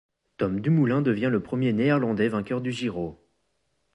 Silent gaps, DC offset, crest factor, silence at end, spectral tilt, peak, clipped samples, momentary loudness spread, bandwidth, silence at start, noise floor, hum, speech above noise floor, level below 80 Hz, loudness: none; under 0.1%; 16 dB; 0.8 s; -8 dB/octave; -10 dBFS; under 0.1%; 8 LU; 11 kHz; 0.4 s; -74 dBFS; none; 50 dB; -58 dBFS; -25 LUFS